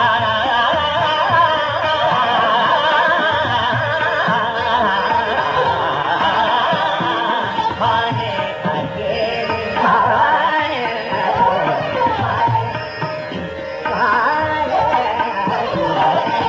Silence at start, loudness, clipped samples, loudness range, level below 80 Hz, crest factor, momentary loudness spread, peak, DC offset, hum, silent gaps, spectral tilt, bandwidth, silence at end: 0 s; -16 LUFS; under 0.1%; 3 LU; -50 dBFS; 14 dB; 7 LU; -4 dBFS; under 0.1%; none; none; -5.5 dB/octave; 7.6 kHz; 0 s